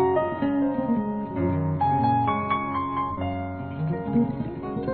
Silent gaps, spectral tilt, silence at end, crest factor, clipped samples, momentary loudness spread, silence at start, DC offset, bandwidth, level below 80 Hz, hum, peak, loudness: none; -12 dB/octave; 0 s; 14 dB; under 0.1%; 8 LU; 0 s; 0.1%; 4.5 kHz; -52 dBFS; none; -12 dBFS; -26 LUFS